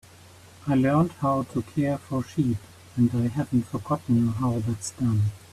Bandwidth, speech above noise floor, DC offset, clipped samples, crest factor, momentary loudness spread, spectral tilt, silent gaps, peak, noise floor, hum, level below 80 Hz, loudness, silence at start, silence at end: 14 kHz; 25 dB; under 0.1%; under 0.1%; 14 dB; 7 LU; -7.5 dB/octave; none; -10 dBFS; -50 dBFS; none; -54 dBFS; -26 LUFS; 0.6 s; 0.15 s